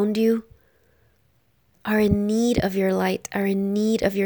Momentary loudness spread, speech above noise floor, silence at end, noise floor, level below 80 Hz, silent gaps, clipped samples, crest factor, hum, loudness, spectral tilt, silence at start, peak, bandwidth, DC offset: 5 LU; 43 dB; 0 s; -64 dBFS; -46 dBFS; none; under 0.1%; 16 dB; none; -22 LUFS; -6 dB/octave; 0 s; -6 dBFS; over 20 kHz; under 0.1%